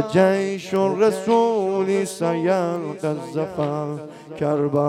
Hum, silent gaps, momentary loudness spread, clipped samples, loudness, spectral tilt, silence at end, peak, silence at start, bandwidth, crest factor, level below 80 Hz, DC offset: none; none; 9 LU; under 0.1%; -21 LUFS; -6.5 dB/octave; 0 s; -4 dBFS; 0 s; 14 kHz; 16 dB; -64 dBFS; under 0.1%